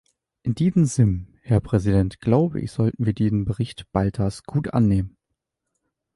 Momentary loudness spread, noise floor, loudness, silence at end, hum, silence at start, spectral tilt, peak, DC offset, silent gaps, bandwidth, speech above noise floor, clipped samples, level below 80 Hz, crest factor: 8 LU; -80 dBFS; -22 LUFS; 1.05 s; none; 0.45 s; -8 dB/octave; -6 dBFS; under 0.1%; none; 11.5 kHz; 59 dB; under 0.1%; -40 dBFS; 16 dB